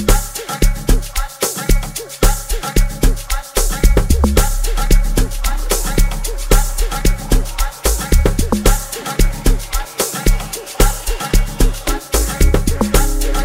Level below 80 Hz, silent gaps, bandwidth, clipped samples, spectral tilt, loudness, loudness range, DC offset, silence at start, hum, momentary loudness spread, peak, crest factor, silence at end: -16 dBFS; none; 16.5 kHz; under 0.1%; -4 dB/octave; -18 LUFS; 2 LU; 0.2%; 0 s; none; 6 LU; 0 dBFS; 14 dB; 0 s